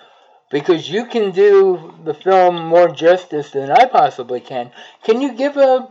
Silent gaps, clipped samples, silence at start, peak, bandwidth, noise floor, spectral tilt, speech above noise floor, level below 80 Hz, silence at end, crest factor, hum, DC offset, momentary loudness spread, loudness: none; under 0.1%; 0.55 s; -2 dBFS; 7.6 kHz; -49 dBFS; -6 dB/octave; 35 dB; -78 dBFS; 0.05 s; 14 dB; none; under 0.1%; 14 LU; -15 LUFS